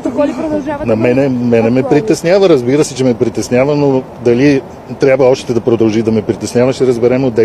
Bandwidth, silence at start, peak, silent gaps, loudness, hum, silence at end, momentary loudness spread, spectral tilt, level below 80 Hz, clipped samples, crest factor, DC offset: 13.5 kHz; 0 s; 0 dBFS; none; -12 LUFS; none; 0 s; 6 LU; -6.5 dB/octave; -44 dBFS; under 0.1%; 10 dB; under 0.1%